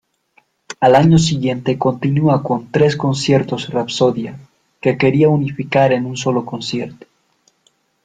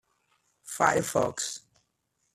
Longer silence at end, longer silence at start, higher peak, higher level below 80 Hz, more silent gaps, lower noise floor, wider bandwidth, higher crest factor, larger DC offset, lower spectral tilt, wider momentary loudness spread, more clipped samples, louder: first, 1.1 s vs 0.75 s; about the same, 0.7 s vs 0.65 s; first, 0 dBFS vs -8 dBFS; first, -48 dBFS vs -66 dBFS; neither; second, -61 dBFS vs -77 dBFS; second, 9.2 kHz vs 14.5 kHz; second, 16 dB vs 24 dB; neither; first, -6.5 dB/octave vs -3 dB/octave; second, 11 LU vs 16 LU; neither; first, -16 LUFS vs -27 LUFS